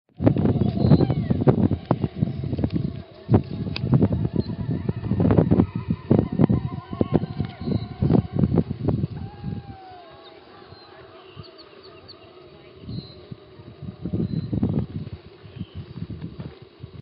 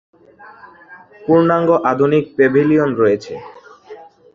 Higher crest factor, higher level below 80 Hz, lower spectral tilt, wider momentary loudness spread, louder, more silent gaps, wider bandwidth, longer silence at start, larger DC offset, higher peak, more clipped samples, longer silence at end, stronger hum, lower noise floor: first, 24 dB vs 14 dB; first, -44 dBFS vs -56 dBFS; about the same, -9 dB/octave vs -8.5 dB/octave; first, 24 LU vs 13 LU; second, -23 LUFS vs -14 LUFS; neither; second, 5.4 kHz vs 7.2 kHz; second, 0.2 s vs 0.9 s; neither; about the same, 0 dBFS vs -2 dBFS; neither; second, 0 s vs 0.3 s; neither; first, -46 dBFS vs -39 dBFS